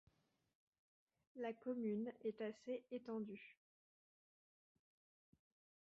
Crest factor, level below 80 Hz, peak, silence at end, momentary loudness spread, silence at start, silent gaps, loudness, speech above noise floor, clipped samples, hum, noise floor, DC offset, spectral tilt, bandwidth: 18 dB; under -90 dBFS; -34 dBFS; 2.35 s; 12 LU; 1.35 s; none; -48 LUFS; over 43 dB; under 0.1%; none; under -90 dBFS; under 0.1%; -6 dB/octave; 7 kHz